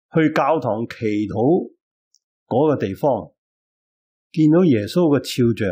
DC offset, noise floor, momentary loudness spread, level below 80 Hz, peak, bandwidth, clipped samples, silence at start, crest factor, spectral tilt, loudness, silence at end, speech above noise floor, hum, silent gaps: under 0.1%; under -90 dBFS; 8 LU; -60 dBFS; -6 dBFS; 16 kHz; under 0.1%; 0.15 s; 14 dB; -7.5 dB/octave; -19 LUFS; 0 s; over 72 dB; none; 1.81-2.11 s, 2.24-2.46 s, 3.38-4.30 s